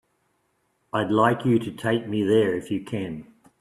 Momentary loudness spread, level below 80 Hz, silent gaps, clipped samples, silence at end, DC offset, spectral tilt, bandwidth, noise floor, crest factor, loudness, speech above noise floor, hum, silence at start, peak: 11 LU; -62 dBFS; none; under 0.1%; 0.35 s; under 0.1%; -7 dB/octave; 13 kHz; -71 dBFS; 20 dB; -24 LUFS; 48 dB; none; 0.95 s; -4 dBFS